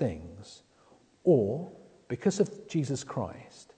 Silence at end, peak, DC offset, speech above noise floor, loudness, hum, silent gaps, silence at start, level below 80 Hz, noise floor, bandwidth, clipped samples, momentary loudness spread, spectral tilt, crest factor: 0.15 s; -12 dBFS; under 0.1%; 32 dB; -30 LUFS; none; none; 0 s; -62 dBFS; -62 dBFS; 9.4 kHz; under 0.1%; 22 LU; -6.5 dB/octave; 20 dB